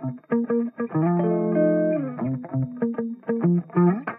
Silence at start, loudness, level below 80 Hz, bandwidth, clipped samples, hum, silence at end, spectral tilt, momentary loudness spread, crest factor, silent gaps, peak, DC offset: 0 s; -24 LUFS; -68 dBFS; 3 kHz; under 0.1%; none; 0 s; -14 dB/octave; 7 LU; 14 dB; none; -10 dBFS; under 0.1%